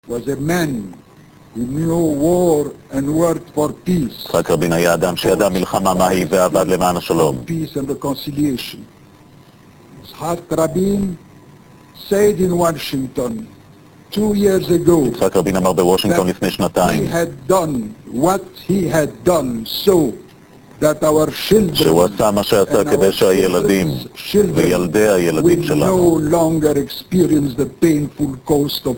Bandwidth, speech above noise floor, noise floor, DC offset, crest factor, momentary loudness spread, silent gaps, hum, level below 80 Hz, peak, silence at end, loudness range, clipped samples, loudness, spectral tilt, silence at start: 17 kHz; 29 dB; -44 dBFS; 0.2%; 16 dB; 9 LU; none; none; -42 dBFS; 0 dBFS; 0 s; 6 LU; under 0.1%; -16 LUFS; -5.5 dB/octave; 0.1 s